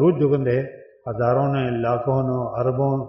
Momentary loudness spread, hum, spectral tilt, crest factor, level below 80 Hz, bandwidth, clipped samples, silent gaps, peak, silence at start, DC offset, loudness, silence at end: 8 LU; none; -8.5 dB/octave; 14 dB; -54 dBFS; 5.8 kHz; under 0.1%; none; -6 dBFS; 0 s; under 0.1%; -21 LUFS; 0 s